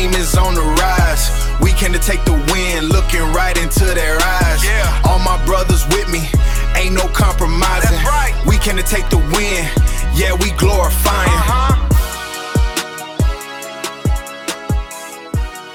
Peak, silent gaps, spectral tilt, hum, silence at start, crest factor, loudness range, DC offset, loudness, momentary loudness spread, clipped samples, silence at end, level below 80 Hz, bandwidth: 0 dBFS; none; -4.5 dB/octave; none; 0 s; 14 dB; 3 LU; 1%; -15 LUFS; 8 LU; under 0.1%; 0 s; -16 dBFS; 18 kHz